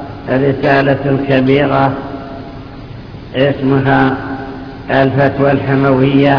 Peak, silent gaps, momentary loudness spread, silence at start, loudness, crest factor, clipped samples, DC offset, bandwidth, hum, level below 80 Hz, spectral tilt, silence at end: 0 dBFS; none; 18 LU; 0 s; -12 LUFS; 12 dB; 0.2%; under 0.1%; 5.4 kHz; none; -36 dBFS; -9 dB/octave; 0 s